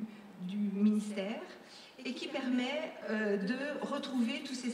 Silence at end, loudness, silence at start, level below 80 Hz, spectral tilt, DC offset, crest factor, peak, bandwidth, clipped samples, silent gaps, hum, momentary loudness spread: 0 s; -36 LUFS; 0 s; -86 dBFS; -5.5 dB/octave; under 0.1%; 16 dB; -20 dBFS; 11.5 kHz; under 0.1%; none; none; 14 LU